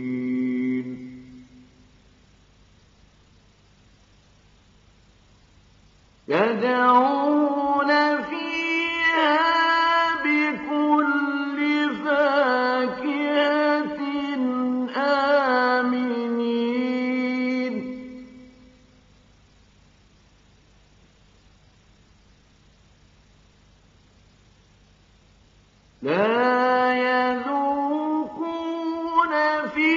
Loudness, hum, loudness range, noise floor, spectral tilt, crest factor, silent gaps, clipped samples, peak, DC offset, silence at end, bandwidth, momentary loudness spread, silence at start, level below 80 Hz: -22 LUFS; none; 11 LU; -56 dBFS; -2 dB/octave; 20 dB; none; under 0.1%; -6 dBFS; under 0.1%; 0 s; 7.4 kHz; 9 LU; 0 s; -62 dBFS